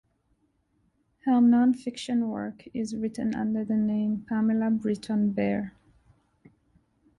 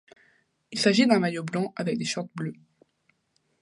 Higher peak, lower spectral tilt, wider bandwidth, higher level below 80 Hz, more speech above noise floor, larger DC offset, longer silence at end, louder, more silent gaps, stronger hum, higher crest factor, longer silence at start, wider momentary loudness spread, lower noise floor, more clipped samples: second, -14 dBFS vs -6 dBFS; first, -7 dB/octave vs -5 dB/octave; about the same, 11 kHz vs 11.5 kHz; first, -62 dBFS vs -74 dBFS; about the same, 45 dB vs 47 dB; neither; first, 1.5 s vs 1.1 s; about the same, -27 LUFS vs -26 LUFS; neither; neither; second, 14 dB vs 22 dB; first, 1.25 s vs 0.7 s; second, 12 LU vs 15 LU; about the same, -71 dBFS vs -72 dBFS; neither